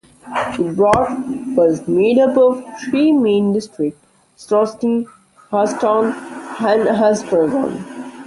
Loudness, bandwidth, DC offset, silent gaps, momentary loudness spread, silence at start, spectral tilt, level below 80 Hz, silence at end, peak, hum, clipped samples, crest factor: -16 LUFS; 11.5 kHz; under 0.1%; none; 11 LU; 0.25 s; -6 dB/octave; -50 dBFS; 0 s; -2 dBFS; none; under 0.1%; 16 dB